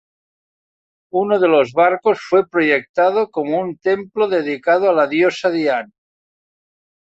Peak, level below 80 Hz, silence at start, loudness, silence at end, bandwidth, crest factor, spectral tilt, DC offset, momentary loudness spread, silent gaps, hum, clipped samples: -2 dBFS; -64 dBFS; 1.15 s; -17 LUFS; 1.35 s; 8 kHz; 16 dB; -6 dB/octave; under 0.1%; 6 LU; 2.89-2.94 s; none; under 0.1%